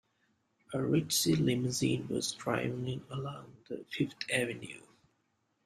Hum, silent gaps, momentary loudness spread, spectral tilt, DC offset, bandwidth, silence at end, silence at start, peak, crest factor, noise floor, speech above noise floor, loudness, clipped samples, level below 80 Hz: none; none; 16 LU; -4.5 dB/octave; under 0.1%; 13.5 kHz; 0.85 s; 0.7 s; -16 dBFS; 20 dB; -78 dBFS; 44 dB; -33 LUFS; under 0.1%; -66 dBFS